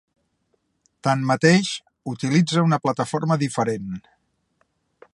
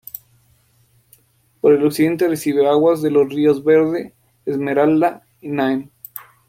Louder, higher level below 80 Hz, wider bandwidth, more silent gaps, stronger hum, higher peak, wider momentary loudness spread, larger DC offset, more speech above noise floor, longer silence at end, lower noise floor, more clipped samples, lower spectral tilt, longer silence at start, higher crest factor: second, -21 LUFS vs -17 LUFS; about the same, -62 dBFS vs -62 dBFS; second, 11.5 kHz vs 16.5 kHz; neither; neither; about the same, -2 dBFS vs -4 dBFS; second, 14 LU vs 20 LU; neither; first, 50 dB vs 42 dB; first, 1.15 s vs 0.25 s; first, -70 dBFS vs -57 dBFS; neither; about the same, -5.5 dB/octave vs -6.5 dB/octave; second, 1.05 s vs 1.65 s; first, 22 dB vs 14 dB